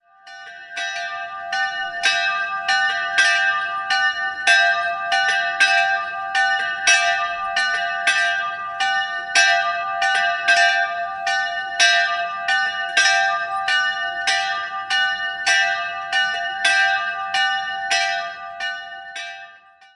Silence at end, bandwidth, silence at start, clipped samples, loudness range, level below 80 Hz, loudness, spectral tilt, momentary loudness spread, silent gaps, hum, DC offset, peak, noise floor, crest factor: 0.4 s; 11.5 kHz; 0.25 s; under 0.1%; 3 LU; -64 dBFS; -19 LUFS; 2 dB/octave; 12 LU; none; none; under 0.1%; -2 dBFS; -47 dBFS; 20 dB